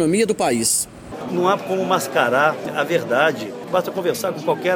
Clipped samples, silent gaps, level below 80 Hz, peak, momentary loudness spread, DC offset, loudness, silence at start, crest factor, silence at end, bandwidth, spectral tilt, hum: under 0.1%; none; -56 dBFS; -2 dBFS; 6 LU; under 0.1%; -20 LUFS; 0 s; 18 dB; 0 s; 20 kHz; -3.5 dB/octave; none